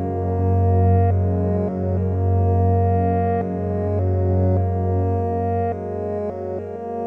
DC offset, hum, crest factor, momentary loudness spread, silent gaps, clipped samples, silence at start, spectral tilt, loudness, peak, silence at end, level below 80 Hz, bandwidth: under 0.1%; none; 14 dB; 8 LU; none; under 0.1%; 0 s; -12 dB/octave; -21 LUFS; -6 dBFS; 0 s; -40 dBFS; 2.7 kHz